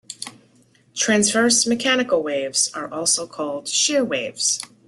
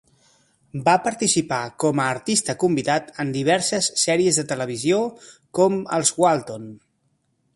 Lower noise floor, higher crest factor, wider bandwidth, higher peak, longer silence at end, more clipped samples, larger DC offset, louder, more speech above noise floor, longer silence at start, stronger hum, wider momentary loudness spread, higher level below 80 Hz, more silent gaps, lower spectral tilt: second, -56 dBFS vs -69 dBFS; about the same, 18 dB vs 18 dB; about the same, 12.5 kHz vs 11.5 kHz; about the same, -4 dBFS vs -4 dBFS; second, 0.2 s vs 0.8 s; neither; neither; about the same, -19 LUFS vs -21 LUFS; second, 36 dB vs 47 dB; second, 0.1 s vs 0.75 s; neither; first, 11 LU vs 8 LU; about the same, -64 dBFS vs -62 dBFS; neither; second, -1.5 dB/octave vs -3.5 dB/octave